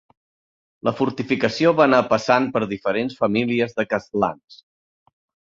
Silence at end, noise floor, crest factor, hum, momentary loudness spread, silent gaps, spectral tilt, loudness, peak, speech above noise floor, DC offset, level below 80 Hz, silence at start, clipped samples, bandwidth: 1.05 s; under -90 dBFS; 20 dB; none; 8 LU; 4.44-4.48 s; -6 dB/octave; -20 LUFS; -2 dBFS; over 70 dB; under 0.1%; -58 dBFS; 0.85 s; under 0.1%; 7.6 kHz